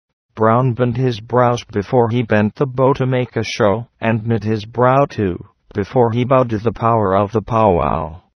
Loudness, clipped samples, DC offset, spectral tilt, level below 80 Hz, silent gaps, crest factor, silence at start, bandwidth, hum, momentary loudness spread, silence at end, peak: -16 LUFS; under 0.1%; under 0.1%; -7.5 dB/octave; -42 dBFS; none; 16 dB; 0.35 s; 6.6 kHz; none; 7 LU; 0.2 s; 0 dBFS